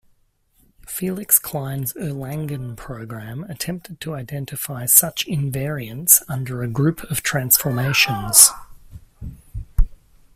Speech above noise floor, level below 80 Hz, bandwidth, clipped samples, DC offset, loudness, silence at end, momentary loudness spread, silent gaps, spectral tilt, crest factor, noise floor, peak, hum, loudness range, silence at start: 41 dB; -32 dBFS; 16 kHz; under 0.1%; under 0.1%; -18 LUFS; 0.4 s; 19 LU; none; -2.5 dB/octave; 22 dB; -61 dBFS; 0 dBFS; none; 8 LU; 0.9 s